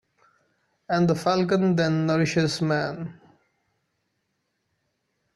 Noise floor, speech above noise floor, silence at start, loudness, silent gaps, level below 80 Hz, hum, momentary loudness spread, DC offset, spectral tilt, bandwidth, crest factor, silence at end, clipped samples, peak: -76 dBFS; 53 dB; 0.9 s; -23 LUFS; none; -62 dBFS; none; 8 LU; under 0.1%; -6 dB/octave; 12 kHz; 16 dB; 2.25 s; under 0.1%; -10 dBFS